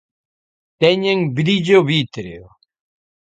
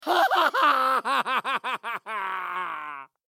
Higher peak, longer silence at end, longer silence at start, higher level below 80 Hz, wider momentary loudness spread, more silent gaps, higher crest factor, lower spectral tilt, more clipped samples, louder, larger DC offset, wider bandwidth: first, 0 dBFS vs -8 dBFS; first, 0.85 s vs 0.2 s; first, 0.8 s vs 0 s; first, -56 dBFS vs under -90 dBFS; first, 15 LU vs 11 LU; neither; about the same, 18 dB vs 18 dB; first, -6.5 dB/octave vs -1.5 dB/octave; neither; first, -16 LUFS vs -24 LUFS; neither; second, 9 kHz vs 17 kHz